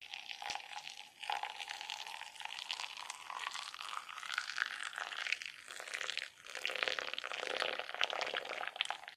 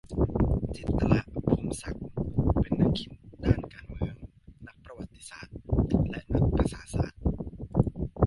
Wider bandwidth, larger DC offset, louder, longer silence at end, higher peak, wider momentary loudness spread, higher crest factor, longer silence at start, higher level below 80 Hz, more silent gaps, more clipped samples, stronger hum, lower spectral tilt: first, 15.5 kHz vs 11.5 kHz; neither; second, -41 LUFS vs -29 LUFS; about the same, 0 s vs 0 s; second, -12 dBFS vs -6 dBFS; second, 9 LU vs 18 LU; first, 30 dB vs 22 dB; about the same, 0 s vs 0.05 s; second, -86 dBFS vs -36 dBFS; neither; neither; neither; second, 1.5 dB/octave vs -8 dB/octave